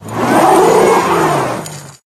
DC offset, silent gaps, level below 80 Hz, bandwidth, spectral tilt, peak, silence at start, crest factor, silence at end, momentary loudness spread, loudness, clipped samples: under 0.1%; none; -46 dBFS; 15.5 kHz; -5 dB/octave; 0 dBFS; 0 s; 12 dB; 0.2 s; 16 LU; -11 LUFS; under 0.1%